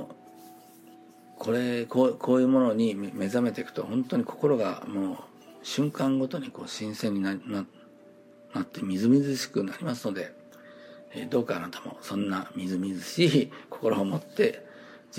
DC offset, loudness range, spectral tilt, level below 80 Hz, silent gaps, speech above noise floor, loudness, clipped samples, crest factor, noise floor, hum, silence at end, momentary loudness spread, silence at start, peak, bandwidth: under 0.1%; 6 LU; -6 dB/octave; -78 dBFS; none; 26 dB; -28 LUFS; under 0.1%; 20 dB; -53 dBFS; none; 0 s; 17 LU; 0 s; -10 dBFS; 16 kHz